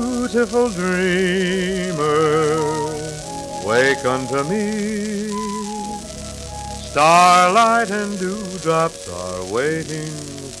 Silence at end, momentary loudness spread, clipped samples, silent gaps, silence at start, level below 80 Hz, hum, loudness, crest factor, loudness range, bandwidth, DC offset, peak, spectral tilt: 0 s; 15 LU; under 0.1%; none; 0 s; -44 dBFS; none; -19 LUFS; 18 dB; 5 LU; 14.5 kHz; under 0.1%; 0 dBFS; -4.5 dB/octave